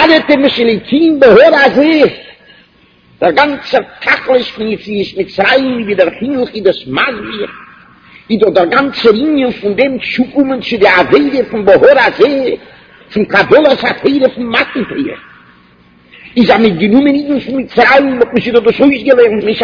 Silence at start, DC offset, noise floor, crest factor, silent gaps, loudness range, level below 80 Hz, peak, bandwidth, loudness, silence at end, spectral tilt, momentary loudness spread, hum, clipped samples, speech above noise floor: 0 s; under 0.1%; -46 dBFS; 10 dB; none; 4 LU; -44 dBFS; 0 dBFS; 5.4 kHz; -10 LUFS; 0 s; -6.5 dB/octave; 11 LU; none; 2%; 37 dB